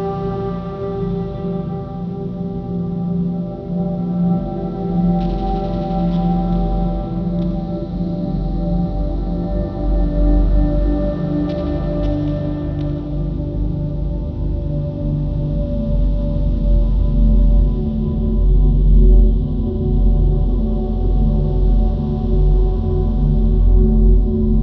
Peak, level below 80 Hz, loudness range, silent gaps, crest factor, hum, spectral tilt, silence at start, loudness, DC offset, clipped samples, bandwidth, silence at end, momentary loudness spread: -2 dBFS; -18 dBFS; 5 LU; none; 14 dB; none; -11.5 dB/octave; 0 s; -19 LUFS; under 0.1%; under 0.1%; 4.3 kHz; 0 s; 8 LU